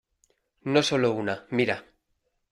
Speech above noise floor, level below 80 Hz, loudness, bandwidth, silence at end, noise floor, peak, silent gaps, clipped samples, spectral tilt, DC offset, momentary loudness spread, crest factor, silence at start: 50 dB; -66 dBFS; -26 LUFS; 15 kHz; 0.7 s; -76 dBFS; -8 dBFS; none; under 0.1%; -5 dB/octave; under 0.1%; 10 LU; 20 dB; 0.65 s